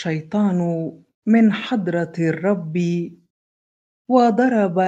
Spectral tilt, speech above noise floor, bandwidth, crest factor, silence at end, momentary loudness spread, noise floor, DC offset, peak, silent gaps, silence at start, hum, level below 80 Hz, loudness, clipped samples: -8 dB/octave; over 72 dB; 7.8 kHz; 18 dB; 0 s; 11 LU; under -90 dBFS; under 0.1%; -2 dBFS; 1.14-1.22 s, 3.30-4.05 s; 0 s; none; -66 dBFS; -19 LUFS; under 0.1%